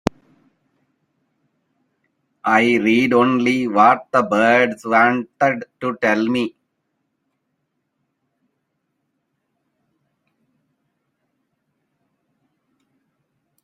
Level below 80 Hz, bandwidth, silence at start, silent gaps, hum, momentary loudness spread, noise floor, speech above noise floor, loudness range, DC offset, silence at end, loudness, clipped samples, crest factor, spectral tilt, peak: -58 dBFS; 12.5 kHz; 2.45 s; none; none; 10 LU; -73 dBFS; 57 dB; 10 LU; under 0.1%; 7.15 s; -17 LUFS; under 0.1%; 22 dB; -5.5 dB/octave; 0 dBFS